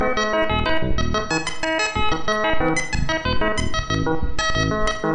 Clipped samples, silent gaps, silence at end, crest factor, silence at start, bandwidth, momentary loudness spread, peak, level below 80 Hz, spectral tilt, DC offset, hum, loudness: under 0.1%; none; 0 s; 12 dB; 0 s; 10 kHz; 3 LU; -8 dBFS; -30 dBFS; -4 dB/octave; under 0.1%; none; -22 LUFS